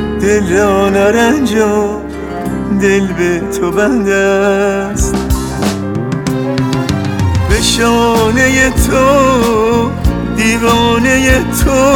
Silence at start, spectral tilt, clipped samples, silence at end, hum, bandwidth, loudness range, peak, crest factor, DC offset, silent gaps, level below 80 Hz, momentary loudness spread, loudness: 0 s; -5 dB/octave; under 0.1%; 0 s; none; 18 kHz; 3 LU; 0 dBFS; 10 dB; under 0.1%; none; -22 dBFS; 7 LU; -11 LUFS